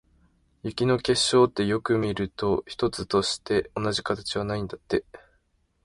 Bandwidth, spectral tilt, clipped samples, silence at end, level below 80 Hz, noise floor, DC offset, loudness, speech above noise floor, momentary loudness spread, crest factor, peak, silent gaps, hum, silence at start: 11.5 kHz; -4.5 dB/octave; under 0.1%; 0.65 s; -52 dBFS; -68 dBFS; under 0.1%; -26 LUFS; 43 dB; 9 LU; 18 dB; -8 dBFS; none; none; 0.65 s